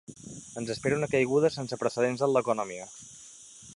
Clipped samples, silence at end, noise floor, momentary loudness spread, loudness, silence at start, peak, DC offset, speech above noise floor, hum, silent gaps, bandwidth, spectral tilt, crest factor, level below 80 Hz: under 0.1%; 0.05 s; -50 dBFS; 20 LU; -28 LUFS; 0.1 s; -12 dBFS; under 0.1%; 22 dB; none; none; 11.5 kHz; -5 dB/octave; 18 dB; -64 dBFS